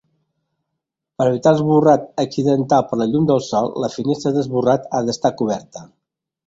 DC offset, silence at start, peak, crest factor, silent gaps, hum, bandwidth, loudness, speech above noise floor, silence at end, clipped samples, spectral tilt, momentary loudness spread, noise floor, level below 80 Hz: under 0.1%; 1.2 s; -2 dBFS; 18 dB; none; none; 7.8 kHz; -18 LUFS; 62 dB; 0.6 s; under 0.1%; -7 dB/octave; 8 LU; -79 dBFS; -58 dBFS